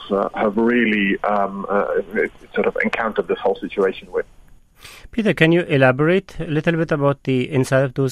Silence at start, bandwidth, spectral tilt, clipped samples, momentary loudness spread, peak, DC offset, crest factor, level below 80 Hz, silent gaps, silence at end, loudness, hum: 0 s; 14 kHz; -7 dB/octave; under 0.1%; 8 LU; 0 dBFS; under 0.1%; 18 dB; -46 dBFS; none; 0 s; -19 LUFS; none